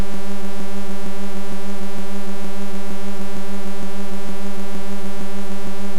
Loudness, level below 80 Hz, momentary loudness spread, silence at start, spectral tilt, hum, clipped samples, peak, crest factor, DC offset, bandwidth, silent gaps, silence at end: -31 LUFS; -48 dBFS; 0 LU; 0 s; -5.5 dB/octave; none; under 0.1%; -6 dBFS; 12 dB; 40%; 16.5 kHz; none; 0 s